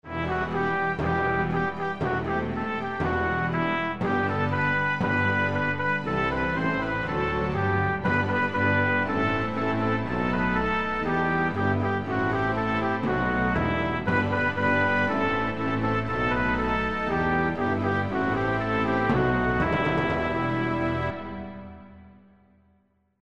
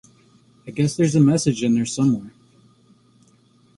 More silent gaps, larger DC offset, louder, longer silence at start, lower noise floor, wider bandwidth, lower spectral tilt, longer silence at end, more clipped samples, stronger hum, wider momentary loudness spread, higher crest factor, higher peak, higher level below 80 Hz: neither; first, 0.5% vs under 0.1%; second, -25 LUFS vs -19 LUFS; second, 0 s vs 0.65 s; first, -66 dBFS vs -56 dBFS; second, 8.4 kHz vs 11.5 kHz; first, -7.5 dB/octave vs -6 dB/octave; second, 0 s vs 1.5 s; neither; neither; second, 4 LU vs 8 LU; about the same, 16 dB vs 16 dB; second, -10 dBFS vs -6 dBFS; first, -44 dBFS vs -56 dBFS